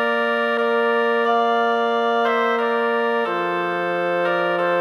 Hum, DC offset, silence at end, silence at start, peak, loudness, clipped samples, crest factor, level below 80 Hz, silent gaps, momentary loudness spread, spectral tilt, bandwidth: none; under 0.1%; 0 s; 0 s; -8 dBFS; -20 LUFS; under 0.1%; 12 dB; -76 dBFS; none; 3 LU; -5.5 dB/octave; 11.5 kHz